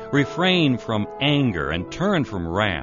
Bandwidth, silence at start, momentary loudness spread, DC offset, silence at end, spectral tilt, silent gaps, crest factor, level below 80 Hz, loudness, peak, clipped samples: 7.4 kHz; 0 s; 7 LU; under 0.1%; 0 s; -4 dB/octave; none; 16 dB; -44 dBFS; -21 LUFS; -6 dBFS; under 0.1%